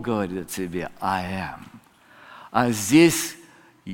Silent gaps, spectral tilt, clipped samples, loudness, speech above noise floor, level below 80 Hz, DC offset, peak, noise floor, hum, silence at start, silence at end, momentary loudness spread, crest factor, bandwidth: none; -4.5 dB/octave; under 0.1%; -23 LUFS; 29 dB; -54 dBFS; under 0.1%; -4 dBFS; -52 dBFS; none; 0 s; 0 s; 20 LU; 20 dB; 17 kHz